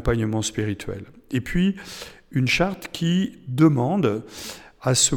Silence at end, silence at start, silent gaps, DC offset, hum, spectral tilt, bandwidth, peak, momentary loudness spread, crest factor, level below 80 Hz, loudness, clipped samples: 0 s; 0 s; none; under 0.1%; none; -4.5 dB/octave; 18.5 kHz; -6 dBFS; 17 LU; 18 dB; -40 dBFS; -23 LUFS; under 0.1%